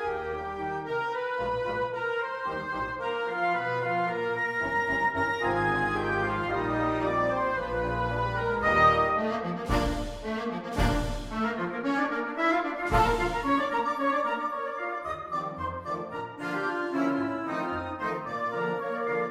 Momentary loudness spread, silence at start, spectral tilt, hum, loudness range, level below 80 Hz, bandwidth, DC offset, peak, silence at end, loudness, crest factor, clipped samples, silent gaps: 7 LU; 0 s; -6 dB/octave; none; 5 LU; -42 dBFS; 16 kHz; under 0.1%; -10 dBFS; 0 s; -29 LUFS; 18 dB; under 0.1%; none